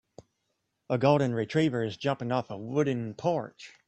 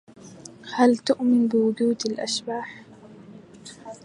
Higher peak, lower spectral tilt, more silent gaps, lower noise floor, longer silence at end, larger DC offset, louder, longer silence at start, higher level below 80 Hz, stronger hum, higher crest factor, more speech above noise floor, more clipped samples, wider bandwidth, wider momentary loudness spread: second, -8 dBFS vs -4 dBFS; first, -7 dB/octave vs -4.5 dB/octave; neither; first, -79 dBFS vs -46 dBFS; about the same, 0.2 s vs 0.1 s; neither; second, -29 LUFS vs -23 LUFS; first, 0.9 s vs 0.25 s; about the same, -66 dBFS vs -70 dBFS; neither; about the same, 20 dB vs 20 dB; first, 51 dB vs 24 dB; neither; second, 8.4 kHz vs 11 kHz; second, 8 LU vs 23 LU